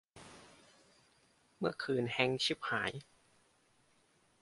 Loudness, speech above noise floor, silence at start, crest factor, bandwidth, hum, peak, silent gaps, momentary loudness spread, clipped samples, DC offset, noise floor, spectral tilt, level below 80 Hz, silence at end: -35 LUFS; 36 dB; 0.15 s; 26 dB; 11.5 kHz; none; -14 dBFS; none; 23 LU; under 0.1%; under 0.1%; -72 dBFS; -4.5 dB/octave; -74 dBFS; 1.4 s